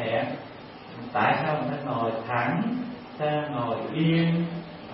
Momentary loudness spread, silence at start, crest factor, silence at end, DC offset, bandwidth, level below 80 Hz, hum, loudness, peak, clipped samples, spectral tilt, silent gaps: 14 LU; 0 s; 18 dB; 0 s; under 0.1%; 5.8 kHz; -64 dBFS; none; -27 LUFS; -10 dBFS; under 0.1%; -11 dB/octave; none